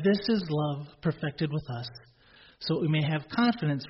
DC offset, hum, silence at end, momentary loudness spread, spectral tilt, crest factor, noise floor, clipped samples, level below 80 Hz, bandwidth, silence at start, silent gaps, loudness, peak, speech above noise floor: under 0.1%; none; 0 s; 12 LU; -5.5 dB/octave; 14 dB; -57 dBFS; under 0.1%; -60 dBFS; 5.8 kHz; 0 s; none; -29 LUFS; -14 dBFS; 28 dB